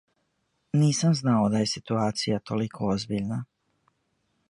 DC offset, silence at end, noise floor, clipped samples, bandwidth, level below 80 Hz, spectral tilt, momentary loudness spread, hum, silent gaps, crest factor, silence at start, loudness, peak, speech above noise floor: under 0.1%; 1.05 s; -74 dBFS; under 0.1%; 11.5 kHz; -60 dBFS; -6 dB/octave; 8 LU; none; none; 16 dB; 0.75 s; -26 LUFS; -12 dBFS; 49 dB